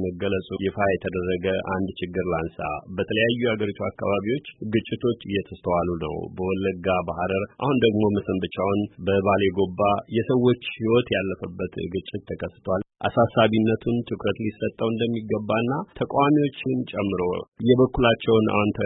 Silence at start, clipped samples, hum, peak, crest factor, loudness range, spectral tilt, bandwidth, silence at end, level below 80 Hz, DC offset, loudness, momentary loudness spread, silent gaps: 0 s; under 0.1%; none; -6 dBFS; 18 dB; 3 LU; -11.5 dB/octave; 4 kHz; 0 s; -50 dBFS; under 0.1%; -24 LUFS; 9 LU; 17.48-17.52 s